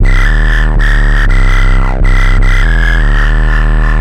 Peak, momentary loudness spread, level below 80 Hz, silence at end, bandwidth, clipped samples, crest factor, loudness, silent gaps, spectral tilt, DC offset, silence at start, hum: 0 dBFS; 1 LU; -6 dBFS; 0 s; 8.4 kHz; under 0.1%; 6 dB; -11 LUFS; none; -6 dB/octave; under 0.1%; 0 s; none